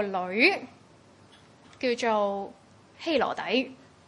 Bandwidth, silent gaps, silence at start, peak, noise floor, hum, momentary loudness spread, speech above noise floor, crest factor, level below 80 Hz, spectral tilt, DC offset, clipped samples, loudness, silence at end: 11.5 kHz; none; 0 s; -8 dBFS; -56 dBFS; none; 15 LU; 29 dB; 22 dB; -72 dBFS; -4 dB/octave; under 0.1%; under 0.1%; -27 LUFS; 0.3 s